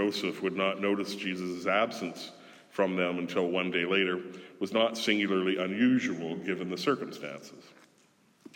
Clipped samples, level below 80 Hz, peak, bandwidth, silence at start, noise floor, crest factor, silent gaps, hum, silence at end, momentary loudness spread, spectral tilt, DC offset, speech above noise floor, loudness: under 0.1%; -84 dBFS; -12 dBFS; 17.5 kHz; 0 s; -65 dBFS; 20 dB; none; none; 0.05 s; 13 LU; -5 dB/octave; under 0.1%; 35 dB; -30 LUFS